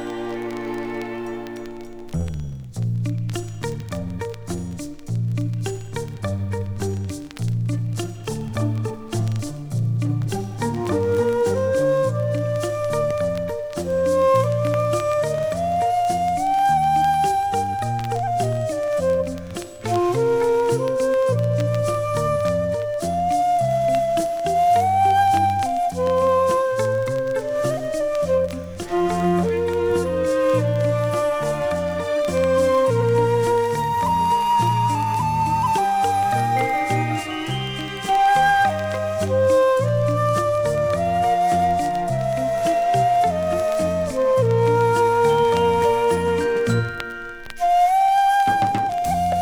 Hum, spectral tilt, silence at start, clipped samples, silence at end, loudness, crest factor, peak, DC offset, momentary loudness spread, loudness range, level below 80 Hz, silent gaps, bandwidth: none; -6 dB/octave; 0 s; under 0.1%; 0 s; -21 LUFS; 14 dB; -6 dBFS; under 0.1%; 11 LU; 8 LU; -46 dBFS; none; over 20 kHz